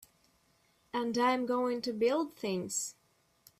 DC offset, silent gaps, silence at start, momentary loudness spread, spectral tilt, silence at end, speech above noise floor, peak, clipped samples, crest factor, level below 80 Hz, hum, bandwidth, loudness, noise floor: under 0.1%; none; 0.95 s; 7 LU; -3.5 dB/octave; 0.7 s; 39 dB; -18 dBFS; under 0.1%; 16 dB; -76 dBFS; none; 14.5 kHz; -33 LUFS; -71 dBFS